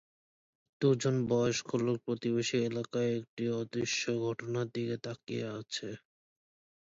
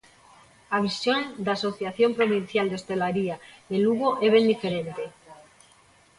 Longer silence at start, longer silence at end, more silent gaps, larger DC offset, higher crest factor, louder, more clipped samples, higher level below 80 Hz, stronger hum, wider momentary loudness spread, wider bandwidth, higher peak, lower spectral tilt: about the same, 0.8 s vs 0.7 s; about the same, 0.85 s vs 0.85 s; first, 3.29-3.37 s vs none; neither; about the same, 18 dB vs 18 dB; second, -33 LUFS vs -25 LUFS; neither; second, -72 dBFS vs -66 dBFS; neither; about the same, 9 LU vs 11 LU; second, 7.8 kHz vs 11.5 kHz; second, -16 dBFS vs -8 dBFS; about the same, -5 dB/octave vs -5.5 dB/octave